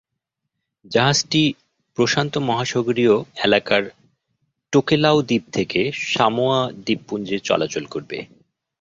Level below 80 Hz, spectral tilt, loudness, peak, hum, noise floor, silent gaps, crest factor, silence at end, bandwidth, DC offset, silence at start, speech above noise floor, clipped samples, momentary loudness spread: -58 dBFS; -4.5 dB/octave; -20 LUFS; -2 dBFS; none; -80 dBFS; none; 20 dB; 0.55 s; 7.8 kHz; under 0.1%; 0.9 s; 60 dB; under 0.1%; 11 LU